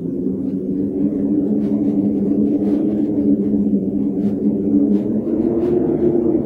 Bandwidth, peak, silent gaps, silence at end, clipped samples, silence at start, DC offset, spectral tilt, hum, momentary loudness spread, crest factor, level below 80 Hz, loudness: 3.1 kHz; -6 dBFS; none; 0 s; under 0.1%; 0 s; under 0.1%; -12 dB/octave; none; 5 LU; 12 dB; -46 dBFS; -18 LUFS